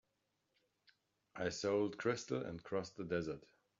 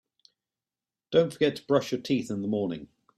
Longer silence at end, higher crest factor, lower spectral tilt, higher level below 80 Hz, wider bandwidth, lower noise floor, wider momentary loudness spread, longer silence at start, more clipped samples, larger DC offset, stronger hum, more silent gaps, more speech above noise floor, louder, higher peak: about the same, 0.4 s vs 0.3 s; about the same, 18 dB vs 20 dB; about the same, -5 dB/octave vs -6 dB/octave; second, -74 dBFS vs -68 dBFS; second, 7.4 kHz vs 13.5 kHz; second, -85 dBFS vs under -90 dBFS; first, 9 LU vs 6 LU; first, 1.35 s vs 1.1 s; neither; neither; neither; neither; second, 44 dB vs over 63 dB; second, -41 LUFS vs -28 LUFS; second, -24 dBFS vs -10 dBFS